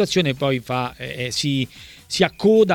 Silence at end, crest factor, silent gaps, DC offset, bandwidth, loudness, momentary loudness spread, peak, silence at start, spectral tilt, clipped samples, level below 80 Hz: 0 s; 16 dB; none; under 0.1%; 18 kHz; -21 LUFS; 12 LU; -4 dBFS; 0 s; -5 dB/octave; under 0.1%; -52 dBFS